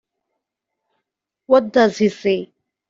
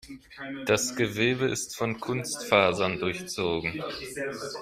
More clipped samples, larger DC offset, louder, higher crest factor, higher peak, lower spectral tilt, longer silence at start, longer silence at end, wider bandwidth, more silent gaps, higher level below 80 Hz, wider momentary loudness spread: neither; neither; first, -17 LUFS vs -28 LUFS; about the same, 18 dB vs 22 dB; first, -2 dBFS vs -6 dBFS; first, -5.5 dB/octave vs -3.5 dB/octave; first, 1.5 s vs 0.05 s; first, 0.45 s vs 0 s; second, 7.6 kHz vs 16 kHz; neither; about the same, -62 dBFS vs -58 dBFS; second, 7 LU vs 12 LU